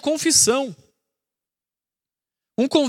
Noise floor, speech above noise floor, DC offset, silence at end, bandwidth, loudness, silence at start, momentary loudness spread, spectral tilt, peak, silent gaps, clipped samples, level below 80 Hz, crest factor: under -90 dBFS; over 71 dB; under 0.1%; 0 s; 17 kHz; -17 LUFS; 0.05 s; 17 LU; -2 dB/octave; -4 dBFS; none; under 0.1%; -64 dBFS; 20 dB